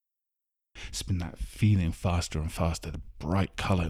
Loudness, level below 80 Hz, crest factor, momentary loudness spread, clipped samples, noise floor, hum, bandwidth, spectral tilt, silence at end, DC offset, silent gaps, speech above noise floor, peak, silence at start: -30 LUFS; -40 dBFS; 16 dB; 13 LU; under 0.1%; -87 dBFS; none; 14.5 kHz; -6 dB/octave; 0 s; under 0.1%; none; 58 dB; -12 dBFS; 0.75 s